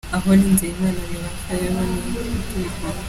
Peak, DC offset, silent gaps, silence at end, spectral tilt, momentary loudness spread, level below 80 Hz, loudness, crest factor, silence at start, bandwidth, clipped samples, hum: -4 dBFS; under 0.1%; none; 0 s; -5.5 dB/octave; 12 LU; -32 dBFS; -21 LUFS; 16 dB; 0.05 s; 15.5 kHz; under 0.1%; none